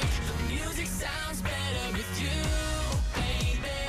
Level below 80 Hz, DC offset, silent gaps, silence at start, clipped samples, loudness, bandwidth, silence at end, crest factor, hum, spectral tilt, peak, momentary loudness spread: -34 dBFS; under 0.1%; none; 0 s; under 0.1%; -31 LUFS; 15.5 kHz; 0 s; 14 dB; none; -4 dB/octave; -16 dBFS; 3 LU